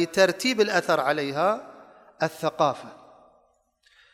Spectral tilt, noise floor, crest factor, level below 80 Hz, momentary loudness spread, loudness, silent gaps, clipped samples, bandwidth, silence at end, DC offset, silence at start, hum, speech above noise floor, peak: -4 dB/octave; -66 dBFS; 20 dB; -72 dBFS; 10 LU; -24 LUFS; none; under 0.1%; 16 kHz; 1.2 s; under 0.1%; 0 s; none; 42 dB; -6 dBFS